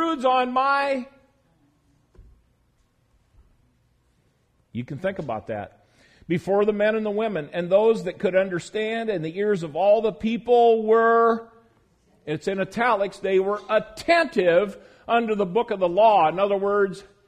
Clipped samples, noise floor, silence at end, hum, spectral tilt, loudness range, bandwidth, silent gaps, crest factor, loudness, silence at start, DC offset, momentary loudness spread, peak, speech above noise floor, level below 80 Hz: under 0.1%; -65 dBFS; 0.25 s; none; -6 dB/octave; 14 LU; 10.5 kHz; none; 18 dB; -22 LUFS; 0 s; under 0.1%; 13 LU; -6 dBFS; 44 dB; -60 dBFS